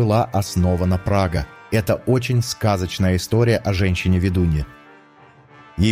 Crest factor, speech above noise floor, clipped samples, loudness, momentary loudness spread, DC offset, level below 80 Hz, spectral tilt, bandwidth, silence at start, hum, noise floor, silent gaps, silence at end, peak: 14 dB; 30 dB; under 0.1%; -20 LUFS; 5 LU; under 0.1%; -34 dBFS; -6.5 dB/octave; 16 kHz; 0 s; none; -48 dBFS; none; 0 s; -6 dBFS